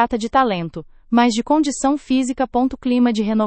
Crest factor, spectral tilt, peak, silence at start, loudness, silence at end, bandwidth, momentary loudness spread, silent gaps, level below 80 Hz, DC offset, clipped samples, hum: 16 dB; -5 dB/octave; -2 dBFS; 0 s; -18 LUFS; 0 s; 8.8 kHz; 4 LU; none; -46 dBFS; under 0.1%; under 0.1%; none